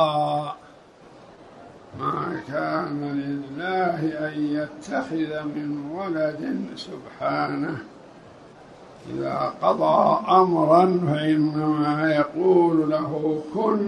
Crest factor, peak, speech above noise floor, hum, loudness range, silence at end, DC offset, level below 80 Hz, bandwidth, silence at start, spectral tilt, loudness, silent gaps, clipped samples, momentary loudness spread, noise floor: 20 dB; -4 dBFS; 26 dB; none; 10 LU; 0 s; under 0.1%; -64 dBFS; 10.5 kHz; 0 s; -7.5 dB/octave; -23 LUFS; none; under 0.1%; 13 LU; -49 dBFS